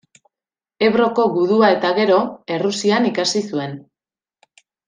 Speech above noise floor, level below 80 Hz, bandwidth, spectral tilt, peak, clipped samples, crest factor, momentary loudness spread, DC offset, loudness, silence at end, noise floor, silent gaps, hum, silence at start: over 73 dB; -64 dBFS; 10 kHz; -4.5 dB/octave; -2 dBFS; under 0.1%; 16 dB; 10 LU; under 0.1%; -17 LUFS; 1.05 s; under -90 dBFS; none; none; 0.8 s